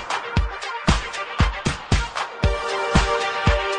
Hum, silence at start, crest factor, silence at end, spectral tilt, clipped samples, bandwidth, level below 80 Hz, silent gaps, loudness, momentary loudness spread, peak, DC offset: none; 0 s; 18 dB; 0 s; -5 dB/octave; under 0.1%; 10 kHz; -26 dBFS; none; -23 LUFS; 6 LU; -4 dBFS; under 0.1%